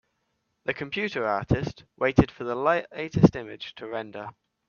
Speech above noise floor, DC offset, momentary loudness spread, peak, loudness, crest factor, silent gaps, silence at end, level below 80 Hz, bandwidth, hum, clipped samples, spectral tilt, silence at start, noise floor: 50 dB; under 0.1%; 17 LU; -2 dBFS; -26 LUFS; 24 dB; none; 0.4 s; -48 dBFS; 7 kHz; none; under 0.1%; -7.5 dB/octave; 0.65 s; -76 dBFS